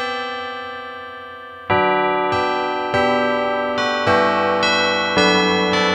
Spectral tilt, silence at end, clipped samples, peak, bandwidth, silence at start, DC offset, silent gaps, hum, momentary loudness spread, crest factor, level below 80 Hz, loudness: -4.5 dB/octave; 0 s; under 0.1%; -2 dBFS; 10.5 kHz; 0 s; under 0.1%; none; none; 15 LU; 16 dB; -54 dBFS; -17 LUFS